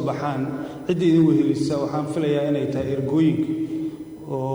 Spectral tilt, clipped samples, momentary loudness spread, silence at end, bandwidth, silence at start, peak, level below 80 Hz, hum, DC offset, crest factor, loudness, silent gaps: -8 dB/octave; under 0.1%; 12 LU; 0 s; over 20 kHz; 0 s; -8 dBFS; -56 dBFS; none; under 0.1%; 14 dB; -22 LUFS; none